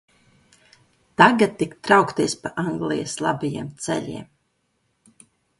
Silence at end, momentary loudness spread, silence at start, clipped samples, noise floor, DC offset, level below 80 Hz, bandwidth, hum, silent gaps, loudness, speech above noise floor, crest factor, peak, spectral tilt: 1.35 s; 14 LU; 1.2 s; under 0.1%; -70 dBFS; under 0.1%; -60 dBFS; 11.5 kHz; none; none; -21 LUFS; 49 dB; 22 dB; -2 dBFS; -4.5 dB/octave